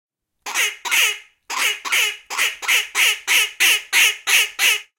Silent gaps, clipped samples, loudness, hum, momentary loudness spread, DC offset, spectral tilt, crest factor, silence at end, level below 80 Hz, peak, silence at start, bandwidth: none; under 0.1%; -16 LUFS; none; 7 LU; under 0.1%; 4.5 dB/octave; 18 dB; 0.15 s; -70 dBFS; -2 dBFS; 0.45 s; 17 kHz